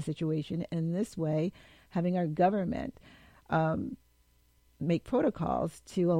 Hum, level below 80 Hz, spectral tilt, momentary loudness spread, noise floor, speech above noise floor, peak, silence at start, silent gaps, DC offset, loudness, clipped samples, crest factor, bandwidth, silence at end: none; -58 dBFS; -8 dB/octave; 10 LU; -67 dBFS; 36 dB; -14 dBFS; 0 s; none; under 0.1%; -32 LUFS; under 0.1%; 18 dB; 13 kHz; 0 s